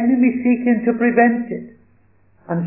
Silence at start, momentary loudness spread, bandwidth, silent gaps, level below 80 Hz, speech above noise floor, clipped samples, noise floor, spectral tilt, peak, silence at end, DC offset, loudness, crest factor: 0 s; 13 LU; 3 kHz; none; -64 dBFS; 40 dB; under 0.1%; -57 dBFS; -12.5 dB/octave; -2 dBFS; 0 s; 0.1%; -17 LUFS; 16 dB